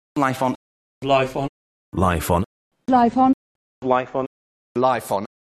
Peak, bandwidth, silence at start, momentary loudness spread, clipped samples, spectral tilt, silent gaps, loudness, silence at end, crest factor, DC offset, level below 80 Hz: -4 dBFS; 13.5 kHz; 0.15 s; 14 LU; under 0.1%; -6 dB/octave; 0.56-1.01 s, 1.49-1.92 s, 2.46-2.71 s, 3.34-3.82 s, 4.26-4.75 s; -21 LUFS; 0.2 s; 18 dB; under 0.1%; -44 dBFS